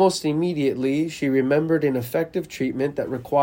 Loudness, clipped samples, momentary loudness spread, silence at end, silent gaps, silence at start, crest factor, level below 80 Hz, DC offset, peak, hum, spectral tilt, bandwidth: -23 LUFS; under 0.1%; 6 LU; 0 s; none; 0 s; 16 dB; -58 dBFS; under 0.1%; -6 dBFS; none; -6 dB/octave; 16.5 kHz